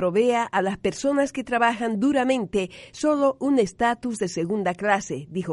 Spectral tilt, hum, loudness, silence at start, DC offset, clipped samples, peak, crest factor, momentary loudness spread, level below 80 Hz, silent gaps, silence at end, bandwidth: -5 dB/octave; none; -24 LUFS; 0 s; under 0.1%; under 0.1%; -8 dBFS; 16 dB; 6 LU; -56 dBFS; none; 0 s; 11.5 kHz